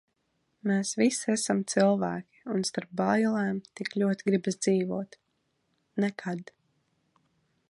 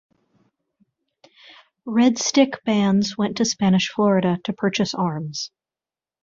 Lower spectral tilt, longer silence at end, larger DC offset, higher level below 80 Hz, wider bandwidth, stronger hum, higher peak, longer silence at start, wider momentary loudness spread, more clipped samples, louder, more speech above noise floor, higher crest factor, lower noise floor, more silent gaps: about the same, -5 dB/octave vs -5 dB/octave; first, 1.25 s vs 0.75 s; neither; second, -74 dBFS vs -62 dBFS; first, 11.5 kHz vs 7.6 kHz; neither; second, -10 dBFS vs -2 dBFS; second, 0.65 s vs 1.85 s; about the same, 11 LU vs 10 LU; neither; second, -29 LUFS vs -20 LUFS; second, 48 dB vs over 70 dB; about the same, 20 dB vs 20 dB; second, -76 dBFS vs under -90 dBFS; neither